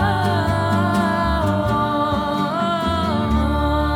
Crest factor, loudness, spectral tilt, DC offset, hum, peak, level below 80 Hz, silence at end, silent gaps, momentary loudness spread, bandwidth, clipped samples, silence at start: 12 dB; -19 LUFS; -7 dB/octave; under 0.1%; none; -6 dBFS; -28 dBFS; 0 s; none; 2 LU; 18.5 kHz; under 0.1%; 0 s